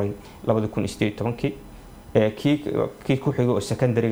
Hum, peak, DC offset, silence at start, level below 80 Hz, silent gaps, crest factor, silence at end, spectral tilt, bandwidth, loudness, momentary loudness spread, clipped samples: none; -4 dBFS; under 0.1%; 0 s; -48 dBFS; none; 20 dB; 0 s; -7 dB/octave; over 20 kHz; -24 LUFS; 7 LU; under 0.1%